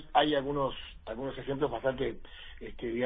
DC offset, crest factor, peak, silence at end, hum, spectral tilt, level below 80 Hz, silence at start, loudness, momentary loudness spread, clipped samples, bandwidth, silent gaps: under 0.1%; 22 dB; -12 dBFS; 0 s; none; -8.5 dB/octave; -50 dBFS; 0 s; -33 LUFS; 18 LU; under 0.1%; 5 kHz; none